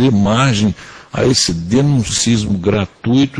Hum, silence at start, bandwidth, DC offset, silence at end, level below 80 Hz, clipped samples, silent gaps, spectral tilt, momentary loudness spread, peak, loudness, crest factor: none; 0 s; 10.5 kHz; under 0.1%; 0 s; -38 dBFS; under 0.1%; none; -5 dB/octave; 6 LU; 0 dBFS; -14 LUFS; 14 dB